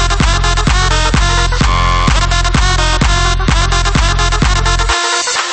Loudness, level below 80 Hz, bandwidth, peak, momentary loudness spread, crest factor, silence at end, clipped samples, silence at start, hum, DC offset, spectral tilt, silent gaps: -12 LUFS; -14 dBFS; 8.8 kHz; 0 dBFS; 1 LU; 10 dB; 0 s; under 0.1%; 0 s; none; under 0.1%; -3.5 dB/octave; none